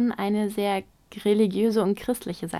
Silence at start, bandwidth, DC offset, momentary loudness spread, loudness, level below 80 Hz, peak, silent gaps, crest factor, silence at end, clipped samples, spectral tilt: 0 s; 16 kHz; under 0.1%; 8 LU; -25 LUFS; -58 dBFS; -10 dBFS; none; 14 dB; 0 s; under 0.1%; -6 dB/octave